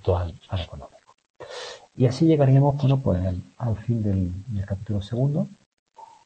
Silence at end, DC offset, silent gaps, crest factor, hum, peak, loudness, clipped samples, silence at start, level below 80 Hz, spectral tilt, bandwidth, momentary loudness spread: 0.2 s; under 0.1%; 1.30-1.34 s, 5.66-5.72 s, 5.79-5.86 s; 18 dB; none; -6 dBFS; -24 LUFS; under 0.1%; 0.05 s; -46 dBFS; -8.5 dB/octave; 8.6 kHz; 18 LU